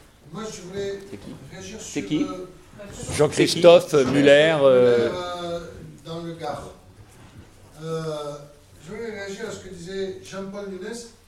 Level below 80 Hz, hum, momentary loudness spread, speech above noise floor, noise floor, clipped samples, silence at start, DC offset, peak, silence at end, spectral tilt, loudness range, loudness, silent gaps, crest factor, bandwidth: -54 dBFS; none; 24 LU; 25 dB; -47 dBFS; under 0.1%; 0.25 s; under 0.1%; 0 dBFS; 0.2 s; -5 dB/octave; 17 LU; -20 LUFS; none; 22 dB; 14 kHz